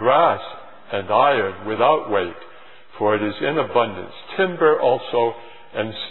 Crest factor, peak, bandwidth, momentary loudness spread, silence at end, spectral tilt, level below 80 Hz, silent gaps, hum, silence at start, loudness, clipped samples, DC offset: 18 dB; -2 dBFS; 4.2 kHz; 15 LU; 0 s; -9 dB/octave; -64 dBFS; none; none; 0 s; -20 LUFS; under 0.1%; 0.8%